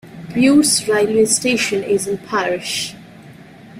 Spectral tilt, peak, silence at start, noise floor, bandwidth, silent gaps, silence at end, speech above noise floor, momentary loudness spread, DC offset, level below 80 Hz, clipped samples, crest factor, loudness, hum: -3 dB/octave; -2 dBFS; 0.05 s; -40 dBFS; 16 kHz; none; 0 s; 24 dB; 10 LU; under 0.1%; -54 dBFS; under 0.1%; 16 dB; -16 LUFS; none